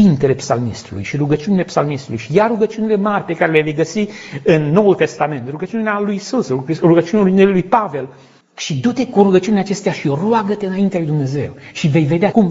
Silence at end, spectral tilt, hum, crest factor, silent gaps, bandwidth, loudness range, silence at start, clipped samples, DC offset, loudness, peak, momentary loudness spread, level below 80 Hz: 0 s; -6.5 dB/octave; none; 16 dB; none; 8 kHz; 2 LU; 0 s; under 0.1%; under 0.1%; -16 LUFS; 0 dBFS; 11 LU; -52 dBFS